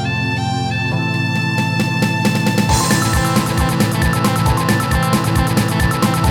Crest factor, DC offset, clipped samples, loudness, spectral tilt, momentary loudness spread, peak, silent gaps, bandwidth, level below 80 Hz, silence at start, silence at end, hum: 12 dB; 0.1%; under 0.1%; -16 LUFS; -5 dB/octave; 4 LU; -2 dBFS; none; 18 kHz; -28 dBFS; 0 s; 0 s; none